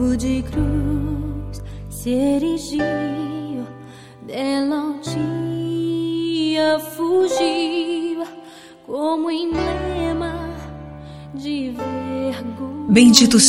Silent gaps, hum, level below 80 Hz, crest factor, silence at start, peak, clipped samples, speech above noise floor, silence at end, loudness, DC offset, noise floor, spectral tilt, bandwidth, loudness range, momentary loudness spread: none; none; -36 dBFS; 20 dB; 0 s; 0 dBFS; under 0.1%; 23 dB; 0 s; -20 LUFS; under 0.1%; -41 dBFS; -4 dB/octave; 16.5 kHz; 4 LU; 15 LU